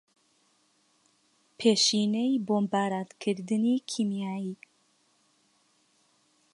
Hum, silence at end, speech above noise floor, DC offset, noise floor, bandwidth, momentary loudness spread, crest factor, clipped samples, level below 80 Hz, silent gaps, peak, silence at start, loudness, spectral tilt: none; 2 s; 41 dB; under 0.1%; -69 dBFS; 11.5 kHz; 11 LU; 20 dB; under 0.1%; -82 dBFS; none; -10 dBFS; 1.6 s; -28 LUFS; -4 dB/octave